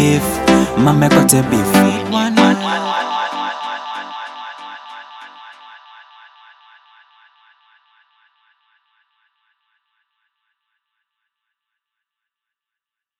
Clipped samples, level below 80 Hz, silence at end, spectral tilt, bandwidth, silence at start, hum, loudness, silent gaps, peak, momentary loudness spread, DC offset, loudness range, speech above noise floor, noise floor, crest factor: under 0.1%; -46 dBFS; 7.45 s; -4.5 dB/octave; 17 kHz; 0 s; none; -14 LUFS; none; 0 dBFS; 24 LU; under 0.1%; 23 LU; 75 dB; -86 dBFS; 20 dB